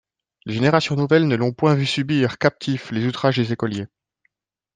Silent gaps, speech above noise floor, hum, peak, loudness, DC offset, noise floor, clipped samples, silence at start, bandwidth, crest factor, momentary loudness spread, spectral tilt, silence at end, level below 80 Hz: none; 50 dB; none; -2 dBFS; -20 LUFS; under 0.1%; -70 dBFS; under 0.1%; 0.45 s; 9.4 kHz; 18 dB; 10 LU; -6.5 dB/octave; 0.9 s; -60 dBFS